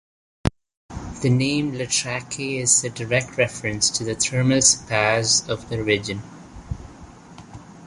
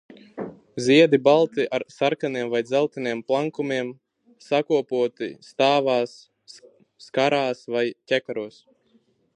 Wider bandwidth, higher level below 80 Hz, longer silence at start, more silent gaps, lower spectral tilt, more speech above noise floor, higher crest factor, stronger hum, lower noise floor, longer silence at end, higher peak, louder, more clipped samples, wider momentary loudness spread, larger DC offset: first, 11.5 kHz vs 10 kHz; first, -44 dBFS vs -74 dBFS; about the same, 0.45 s vs 0.35 s; first, 0.77-0.89 s vs none; second, -3 dB/octave vs -5 dB/octave; second, 21 dB vs 41 dB; about the same, 20 dB vs 20 dB; neither; second, -43 dBFS vs -63 dBFS; second, 0 s vs 0.85 s; about the same, -2 dBFS vs -4 dBFS; about the same, -21 LUFS vs -23 LUFS; neither; first, 19 LU vs 16 LU; neither